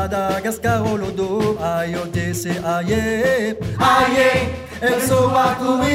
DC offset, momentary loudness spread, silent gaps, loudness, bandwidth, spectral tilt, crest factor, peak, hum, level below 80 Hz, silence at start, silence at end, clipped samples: under 0.1%; 8 LU; none; -18 LUFS; 16 kHz; -5 dB/octave; 16 dB; -2 dBFS; none; -40 dBFS; 0 s; 0 s; under 0.1%